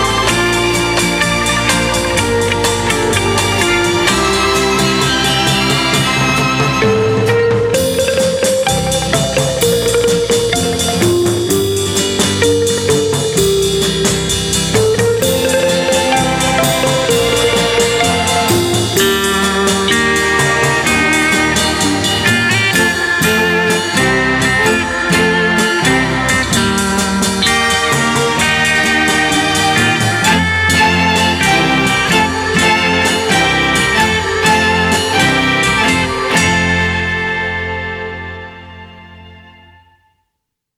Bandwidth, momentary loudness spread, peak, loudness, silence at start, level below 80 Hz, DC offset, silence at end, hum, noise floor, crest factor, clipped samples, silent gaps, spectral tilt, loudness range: 17 kHz; 3 LU; 0 dBFS; -12 LUFS; 0 s; -32 dBFS; under 0.1%; 1.4 s; none; -74 dBFS; 12 dB; under 0.1%; none; -3.5 dB/octave; 2 LU